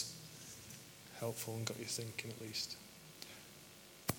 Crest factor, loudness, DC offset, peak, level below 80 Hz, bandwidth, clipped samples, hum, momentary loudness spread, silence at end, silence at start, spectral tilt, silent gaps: 30 dB; -45 LUFS; under 0.1%; -16 dBFS; -76 dBFS; 17.5 kHz; under 0.1%; none; 13 LU; 0 s; 0 s; -3 dB/octave; none